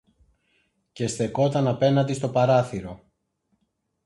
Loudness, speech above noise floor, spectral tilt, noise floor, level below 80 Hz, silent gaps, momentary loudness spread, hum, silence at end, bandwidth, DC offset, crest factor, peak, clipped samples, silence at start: -23 LUFS; 52 dB; -6.5 dB/octave; -75 dBFS; -56 dBFS; none; 11 LU; none; 1.1 s; 11.5 kHz; under 0.1%; 18 dB; -8 dBFS; under 0.1%; 0.95 s